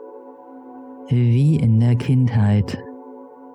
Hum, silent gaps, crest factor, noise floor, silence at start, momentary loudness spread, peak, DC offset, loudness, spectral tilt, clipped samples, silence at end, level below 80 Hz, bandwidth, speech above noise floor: none; none; 12 dB; -40 dBFS; 0 s; 23 LU; -8 dBFS; under 0.1%; -18 LUFS; -9 dB/octave; under 0.1%; 0.05 s; -48 dBFS; 8.2 kHz; 24 dB